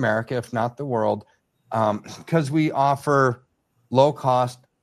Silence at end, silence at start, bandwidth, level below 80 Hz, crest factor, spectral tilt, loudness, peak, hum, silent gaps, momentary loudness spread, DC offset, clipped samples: 0.3 s; 0 s; 13 kHz; -64 dBFS; 20 dB; -7 dB/octave; -22 LUFS; -2 dBFS; none; none; 9 LU; under 0.1%; under 0.1%